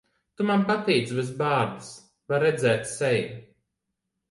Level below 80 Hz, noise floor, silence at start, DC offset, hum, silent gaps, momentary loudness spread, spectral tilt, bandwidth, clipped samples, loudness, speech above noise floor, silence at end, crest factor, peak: -66 dBFS; -82 dBFS; 0.4 s; under 0.1%; none; none; 14 LU; -5.5 dB/octave; 11.5 kHz; under 0.1%; -25 LUFS; 57 dB; 0.9 s; 16 dB; -10 dBFS